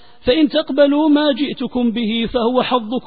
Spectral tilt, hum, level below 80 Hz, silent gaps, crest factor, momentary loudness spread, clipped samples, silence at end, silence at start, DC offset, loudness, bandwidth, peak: -10.5 dB/octave; none; -44 dBFS; none; 14 dB; 6 LU; under 0.1%; 0.05 s; 0.25 s; 0.9%; -16 LUFS; 4.9 kHz; -2 dBFS